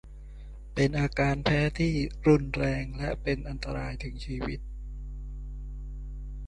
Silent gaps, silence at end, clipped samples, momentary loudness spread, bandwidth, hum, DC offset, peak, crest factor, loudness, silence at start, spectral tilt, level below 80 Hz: none; 0 s; under 0.1%; 17 LU; 11 kHz; 50 Hz at -35 dBFS; under 0.1%; -10 dBFS; 20 dB; -29 LUFS; 0.05 s; -7 dB/octave; -38 dBFS